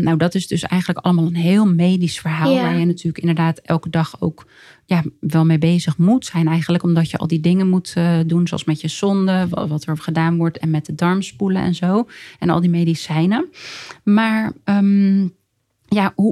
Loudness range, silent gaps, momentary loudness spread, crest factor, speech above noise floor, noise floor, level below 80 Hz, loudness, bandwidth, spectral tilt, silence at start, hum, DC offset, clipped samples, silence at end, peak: 2 LU; none; 7 LU; 16 dB; 44 dB; -61 dBFS; -54 dBFS; -18 LUFS; 12.5 kHz; -7 dB/octave; 0 s; none; under 0.1%; under 0.1%; 0 s; -2 dBFS